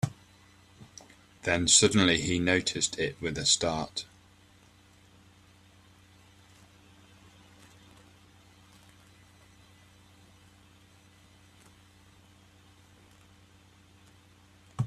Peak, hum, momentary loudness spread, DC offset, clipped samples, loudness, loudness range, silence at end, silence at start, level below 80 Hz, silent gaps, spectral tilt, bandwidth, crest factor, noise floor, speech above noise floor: -6 dBFS; 60 Hz at -65 dBFS; 29 LU; under 0.1%; under 0.1%; -26 LUFS; 10 LU; 0 s; 0.05 s; -60 dBFS; none; -2.5 dB/octave; 14 kHz; 28 dB; -59 dBFS; 32 dB